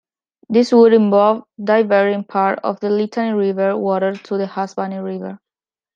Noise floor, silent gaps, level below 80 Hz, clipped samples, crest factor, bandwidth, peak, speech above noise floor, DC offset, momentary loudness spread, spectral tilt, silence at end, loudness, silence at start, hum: under -90 dBFS; none; -70 dBFS; under 0.1%; 14 dB; 7.6 kHz; -2 dBFS; over 74 dB; under 0.1%; 13 LU; -7 dB/octave; 0.6 s; -17 LUFS; 0.5 s; none